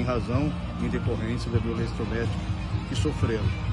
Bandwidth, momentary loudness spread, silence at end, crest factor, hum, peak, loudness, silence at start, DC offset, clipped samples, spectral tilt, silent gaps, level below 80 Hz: 11 kHz; 4 LU; 0 s; 16 dB; none; -10 dBFS; -28 LUFS; 0 s; under 0.1%; under 0.1%; -7 dB/octave; none; -36 dBFS